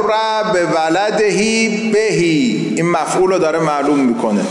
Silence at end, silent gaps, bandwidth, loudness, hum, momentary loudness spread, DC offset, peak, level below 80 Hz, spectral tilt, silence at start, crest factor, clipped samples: 0 s; none; 11.5 kHz; -14 LUFS; none; 2 LU; under 0.1%; -4 dBFS; -52 dBFS; -4.5 dB/octave; 0 s; 10 dB; under 0.1%